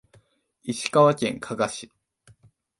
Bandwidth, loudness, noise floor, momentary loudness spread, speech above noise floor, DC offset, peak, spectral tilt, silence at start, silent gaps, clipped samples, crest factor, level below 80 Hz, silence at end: 11.5 kHz; -23 LUFS; -61 dBFS; 17 LU; 38 dB; under 0.1%; -4 dBFS; -5 dB/octave; 0.65 s; none; under 0.1%; 22 dB; -64 dBFS; 0.95 s